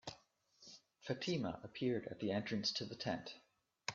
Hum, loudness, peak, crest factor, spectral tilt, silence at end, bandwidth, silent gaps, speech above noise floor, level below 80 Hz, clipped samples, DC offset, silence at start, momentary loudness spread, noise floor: none; -42 LUFS; -22 dBFS; 22 dB; -4 dB/octave; 0 s; 7.4 kHz; none; 29 dB; -76 dBFS; under 0.1%; under 0.1%; 0.05 s; 20 LU; -70 dBFS